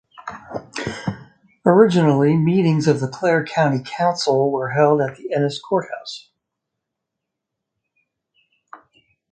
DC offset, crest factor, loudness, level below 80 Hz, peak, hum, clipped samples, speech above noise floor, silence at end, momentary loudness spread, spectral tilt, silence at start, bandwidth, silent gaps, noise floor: under 0.1%; 20 dB; -18 LUFS; -58 dBFS; 0 dBFS; none; under 0.1%; 64 dB; 0.55 s; 17 LU; -6.5 dB/octave; 0.2 s; 9.2 kHz; none; -81 dBFS